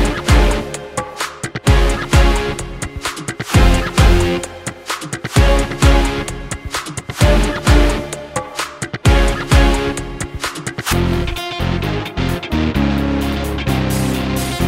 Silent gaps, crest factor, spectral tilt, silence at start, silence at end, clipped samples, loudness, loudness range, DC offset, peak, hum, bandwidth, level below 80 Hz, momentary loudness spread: none; 16 dB; -5 dB/octave; 0 s; 0 s; under 0.1%; -17 LUFS; 3 LU; under 0.1%; 0 dBFS; none; 16.5 kHz; -18 dBFS; 11 LU